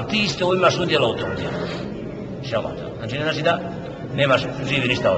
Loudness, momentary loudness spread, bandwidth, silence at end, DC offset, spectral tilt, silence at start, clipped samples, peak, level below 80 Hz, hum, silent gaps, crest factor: -22 LUFS; 13 LU; 8.6 kHz; 0 s; under 0.1%; -5 dB/octave; 0 s; under 0.1%; -4 dBFS; -46 dBFS; none; none; 16 dB